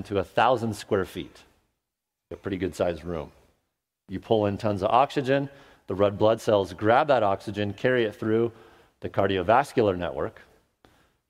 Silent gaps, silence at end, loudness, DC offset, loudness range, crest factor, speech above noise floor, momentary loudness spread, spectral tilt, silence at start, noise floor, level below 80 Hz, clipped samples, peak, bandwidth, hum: none; 1 s; -25 LUFS; under 0.1%; 8 LU; 20 dB; 60 dB; 15 LU; -6.5 dB/octave; 0 s; -85 dBFS; -56 dBFS; under 0.1%; -6 dBFS; 15.5 kHz; none